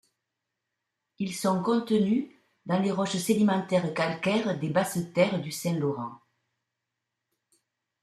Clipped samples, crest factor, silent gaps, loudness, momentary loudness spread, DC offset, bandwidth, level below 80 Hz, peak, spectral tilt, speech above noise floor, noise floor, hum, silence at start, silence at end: under 0.1%; 18 dB; none; -27 LUFS; 10 LU; under 0.1%; 14.5 kHz; -70 dBFS; -10 dBFS; -5.5 dB/octave; 58 dB; -85 dBFS; none; 1.2 s; 1.85 s